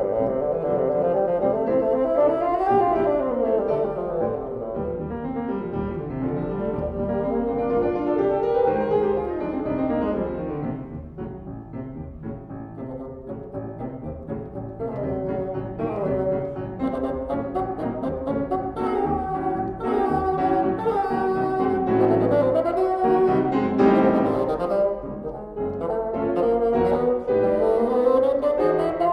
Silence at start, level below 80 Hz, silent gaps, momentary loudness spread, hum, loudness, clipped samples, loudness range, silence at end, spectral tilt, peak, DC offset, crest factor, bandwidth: 0 s; -44 dBFS; none; 14 LU; none; -23 LUFS; under 0.1%; 10 LU; 0 s; -9.5 dB/octave; -6 dBFS; under 0.1%; 18 dB; 5.6 kHz